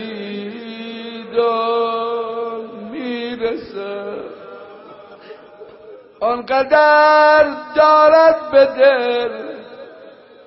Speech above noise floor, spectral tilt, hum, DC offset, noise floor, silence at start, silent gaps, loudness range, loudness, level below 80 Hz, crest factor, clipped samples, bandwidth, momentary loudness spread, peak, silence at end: 28 dB; -1 dB/octave; none; under 0.1%; -41 dBFS; 0 s; none; 15 LU; -15 LUFS; -58 dBFS; 16 dB; under 0.1%; 5.8 kHz; 20 LU; 0 dBFS; 0.35 s